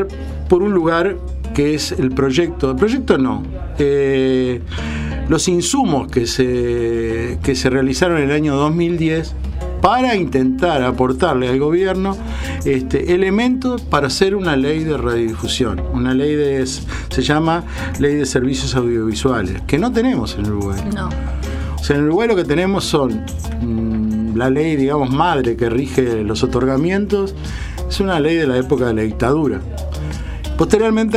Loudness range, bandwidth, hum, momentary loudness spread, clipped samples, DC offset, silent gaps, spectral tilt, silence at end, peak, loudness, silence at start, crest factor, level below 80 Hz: 2 LU; 15 kHz; none; 9 LU; under 0.1%; under 0.1%; none; -5.5 dB/octave; 0 s; 0 dBFS; -17 LUFS; 0 s; 16 dB; -28 dBFS